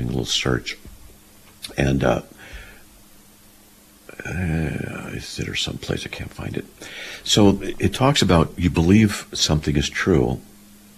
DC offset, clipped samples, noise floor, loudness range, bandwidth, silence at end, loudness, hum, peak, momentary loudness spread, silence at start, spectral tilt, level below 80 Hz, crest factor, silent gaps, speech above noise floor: under 0.1%; under 0.1%; -50 dBFS; 10 LU; 14.5 kHz; 0.5 s; -21 LUFS; none; -4 dBFS; 18 LU; 0 s; -5 dB/octave; -38 dBFS; 18 dB; none; 29 dB